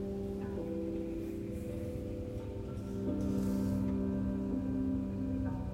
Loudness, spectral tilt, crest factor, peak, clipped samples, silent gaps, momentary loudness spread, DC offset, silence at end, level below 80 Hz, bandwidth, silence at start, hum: -37 LUFS; -9 dB/octave; 12 dB; -24 dBFS; under 0.1%; none; 7 LU; under 0.1%; 0 s; -48 dBFS; 16 kHz; 0 s; none